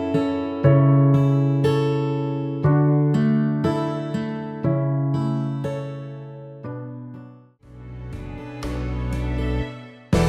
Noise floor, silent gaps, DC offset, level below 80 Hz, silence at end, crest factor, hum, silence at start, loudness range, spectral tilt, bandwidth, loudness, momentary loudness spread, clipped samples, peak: -46 dBFS; none; under 0.1%; -36 dBFS; 0 s; 18 dB; none; 0 s; 14 LU; -8.5 dB/octave; 8.8 kHz; -21 LUFS; 19 LU; under 0.1%; -4 dBFS